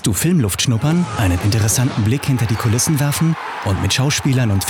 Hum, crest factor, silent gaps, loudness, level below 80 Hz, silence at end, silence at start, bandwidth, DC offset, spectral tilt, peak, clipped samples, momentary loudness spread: none; 10 dB; none; -17 LUFS; -42 dBFS; 0 s; 0 s; 19 kHz; under 0.1%; -4.5 dB/octave; -6 dBFS; under 0.1%; 3 LU